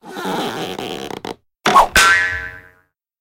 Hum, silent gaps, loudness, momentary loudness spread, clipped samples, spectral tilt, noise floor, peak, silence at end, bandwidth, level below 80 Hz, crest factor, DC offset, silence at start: none; none; -15 LUFS; 19 LU; under 0.1%; -2 dB/octave; -58 dBFS; 0 dBFS; 0.6 s; 17 kHz; -40 dBFS; 18 dB; under 0.1%; 0.05 s